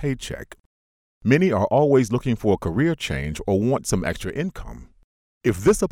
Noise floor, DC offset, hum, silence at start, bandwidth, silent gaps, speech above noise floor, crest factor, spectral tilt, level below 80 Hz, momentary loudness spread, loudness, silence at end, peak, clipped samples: under -90 dBFS; under 0.1%; none; 0 s; 16.5 kHz; 0.60-1.21 s, 5.04-5.41 s; over 69 dB; 18 dB; -6 dB/octave; -40 dBFS; 12 LU; -22 LUFS; 0.05 s; -4 dBFS; under 0.1%